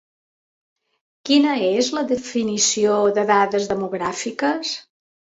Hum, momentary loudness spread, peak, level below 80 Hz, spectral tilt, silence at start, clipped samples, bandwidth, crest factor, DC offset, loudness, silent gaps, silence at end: none; 8 LU; -4 dBFS; -62 dBFS; -3 dB/octave; 1.25 s; under 0.1%; 8 kHz; 18 dB; under 0.1%; -20 LUFS; none; 0.5 s